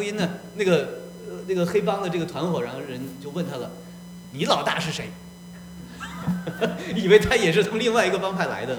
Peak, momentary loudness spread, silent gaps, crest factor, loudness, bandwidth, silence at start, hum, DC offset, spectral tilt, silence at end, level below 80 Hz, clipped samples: -2 dBFS; 21 LU; none; 22 dB; -24 LUFS; over 20 kHz; 0 s; none; under 0.1%; -5 dB/octave; 0 s; -50 dBFS; under 0.1%